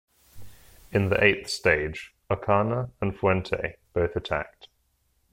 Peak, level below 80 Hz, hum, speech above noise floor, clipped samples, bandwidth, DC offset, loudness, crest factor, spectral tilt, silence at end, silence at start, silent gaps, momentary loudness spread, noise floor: -4 dBFS; -48 dBFS; none; 44 dB; under 0.1%; 16.5 kHz; under 0.1%; -26 LUFS; 22 dB; -5.5 dB/octave; 0.85 s; 0.35 s; none; 10 LU; -70 dBFS